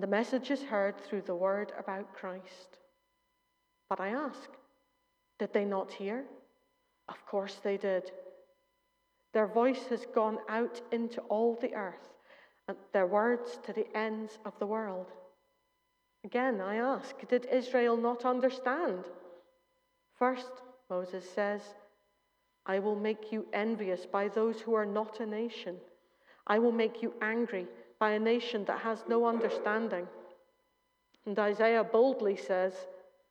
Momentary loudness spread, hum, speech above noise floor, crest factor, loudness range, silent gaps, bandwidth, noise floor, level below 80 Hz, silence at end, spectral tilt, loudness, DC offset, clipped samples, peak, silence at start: 16 LU; none; 46 dB; 20 dB; 7 LU; none; 9.2 kHz; -78 dBFS; -90 dBFS; 0.3 s; -6 dB/octave; -33 LUFS; under 0.1%; under 0.1%; -14 dBFS; 0 s